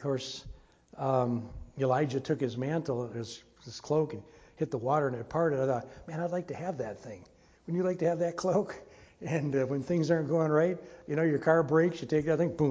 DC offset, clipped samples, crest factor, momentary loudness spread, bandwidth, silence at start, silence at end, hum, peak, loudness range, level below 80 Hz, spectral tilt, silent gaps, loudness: under 0.1%; under 0.1%; 20 dB; 16 LU; 8 kHz; 0 s; 0 s; none; -10 dBFS; 5 LU; -60 dBFS; -7 dB/octave; none; -31 LUFS